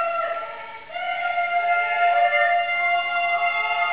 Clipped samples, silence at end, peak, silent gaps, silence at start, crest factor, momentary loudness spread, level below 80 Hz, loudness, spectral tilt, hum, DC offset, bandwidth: under 0.1%; 0 s; -8 dBFS; none; 0 s; 14 dB; 12 LU; -68 dBFS; -21 LUFS; -3.5 dB/octave; none; 0.4%; 4 kHz